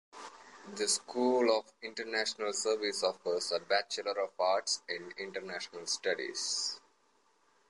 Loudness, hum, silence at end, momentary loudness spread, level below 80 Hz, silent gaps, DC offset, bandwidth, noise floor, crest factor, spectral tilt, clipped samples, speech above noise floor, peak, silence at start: -33 LUFS; none; 0.9 s; 12 LU; -86 dBFS; none; under 0.1%; 11.5 kHz; -71 dBFS; 20 dB; -1 dB/octave; under 0.1%; 37 dB; -14 dBFS; 0.15 s